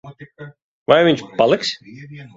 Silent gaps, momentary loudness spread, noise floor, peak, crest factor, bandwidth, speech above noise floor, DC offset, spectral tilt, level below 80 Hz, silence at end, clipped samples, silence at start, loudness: 0.62-0.86 s; 24 LU; -39 dBFS; 0 dBFS; 20 dB; 7.8 kHz; 21 dB; under 0.1%; -5 dB/octave; -60 dBFS; 0.1 s; under 0.1%; 0.05 s; -16 LUFS